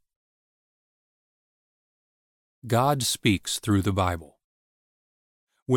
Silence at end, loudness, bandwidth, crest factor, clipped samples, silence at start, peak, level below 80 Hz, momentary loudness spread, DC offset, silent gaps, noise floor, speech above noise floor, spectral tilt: 0 s; -25 LUFS; 17 kHz; 22 dB; under 0.1%; 2.65 s; -8 dBFS; -54 dBFS; 7 LU; under 0.1%; 4.44-5.47 s, 5.62-5.66 s; under -90 dBFS; over 66 dB; -4.5 dB/octave